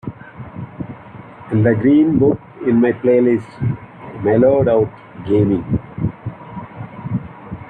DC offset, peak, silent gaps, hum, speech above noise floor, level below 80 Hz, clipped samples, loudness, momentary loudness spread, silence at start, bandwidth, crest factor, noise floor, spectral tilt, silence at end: under 0.1%; -2 dBFS; none; none; 23 dB; -44 dBFS; under 0.1%; -16 LUFS; 20 LU; 0.05 s; 4.6 kHz; 16 dB; -37 dBFS; -11 dB/octave; 0 s